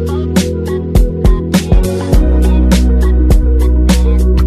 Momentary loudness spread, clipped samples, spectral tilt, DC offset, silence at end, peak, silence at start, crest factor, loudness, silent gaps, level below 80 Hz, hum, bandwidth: 4 LU; under 0.1%; -6.5 dB/octave; under 0.1%; 0 s; 0 dBFS; 0 s; 10 dB; -12 LUFS; none; -10 dBFS; none; 14 kHz